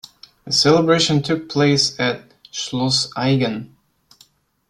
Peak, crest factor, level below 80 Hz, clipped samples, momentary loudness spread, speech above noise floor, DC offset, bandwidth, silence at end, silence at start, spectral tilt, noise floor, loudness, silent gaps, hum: -2 dBFS; 18 dB; -56 dBFS; under 0.1%; 13 LU; 37 dB; under 0.1%; 13 kHz; 1.05 s; 0.45 s; -4.5 dB/octave; -55 dBFS; -17 LUFS; none; none